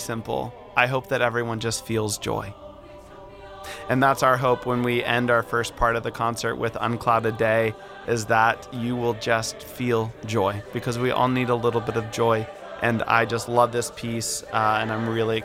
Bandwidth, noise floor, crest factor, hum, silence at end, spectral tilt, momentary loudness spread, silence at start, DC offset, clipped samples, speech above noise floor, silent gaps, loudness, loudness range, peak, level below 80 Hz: 16.5 kHz; -43 dBFS; 20 dB; none; 0 s; -5 dB/octave; 9 LU; 0 s; under 0.1%; under 0.1%; 20 dB; none; -24 LUFS; 3 LU; -4 dBFS; -48 dBFS